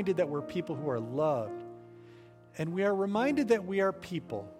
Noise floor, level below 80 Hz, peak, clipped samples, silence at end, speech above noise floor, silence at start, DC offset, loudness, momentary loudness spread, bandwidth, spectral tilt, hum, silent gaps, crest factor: -54 dBFS; -70 dBFS; -14 dBFS; under 0.1%; 0 s; 23 dB; 0 s; under 0.1%; -32 LUFS; 13 LU; 14 kHz; -7 dB/octave; none; none; 18 dB